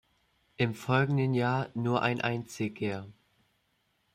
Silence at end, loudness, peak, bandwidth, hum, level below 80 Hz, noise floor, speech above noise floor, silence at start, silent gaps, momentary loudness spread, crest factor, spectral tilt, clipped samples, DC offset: 1 s; -30 LUFS; -12 dBFS; 15 kHz; none; -68 dBFS; -74 dBFS; 45 dB; 0.6 s; none; 8 LU; 20 dB; -6.5 dB/octave; under 0.1%; under 0.1%